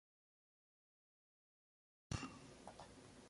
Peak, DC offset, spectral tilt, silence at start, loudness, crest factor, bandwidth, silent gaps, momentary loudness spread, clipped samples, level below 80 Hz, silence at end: -30 dBFS; under 0.1%; -4.5 dB/octave; 2.1 s; -53 LUFS; 28 dB; 11.5 kHz; none; 11 LU; under 0.1%; -66 dBFS; 0 s